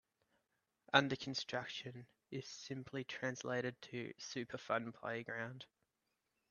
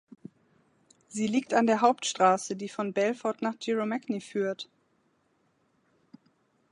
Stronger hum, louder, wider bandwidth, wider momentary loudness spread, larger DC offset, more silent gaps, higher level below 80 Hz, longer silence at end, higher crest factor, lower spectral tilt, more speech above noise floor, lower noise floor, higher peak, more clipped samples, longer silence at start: neither; second, -42 LUFS vs -28 LUFS; second, 7.4 kHz vs 11.5 kHz; first, 15 LU vs 10 LU; neither; neither; about the same, -82 dBFS vs -80 dBFS; second, 0.85 s vs 2.1 s; first, 32 dB vs 22 dB; about the same, -4 dB/octave vs -4 dB/octave; about the same, 45 dB vs 43 dB; first, -87 dBFS vs -71 dBFS; second, -12 dBFS vs -8 dBFS; neither; second, 0.95 s vs 1.1 s